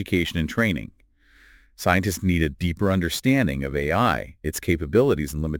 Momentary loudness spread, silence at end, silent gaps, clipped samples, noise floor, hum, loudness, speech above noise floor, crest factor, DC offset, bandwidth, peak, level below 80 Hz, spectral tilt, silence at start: 7 LU; 0 s; none; under 0.1%; -56 dBFS; none; -23 LUFS; 33 dB; 20 dB; under 0.1%; 17 kHz; -4 dBFS; -38 dBFS; -5.5 dB/octave; 0 s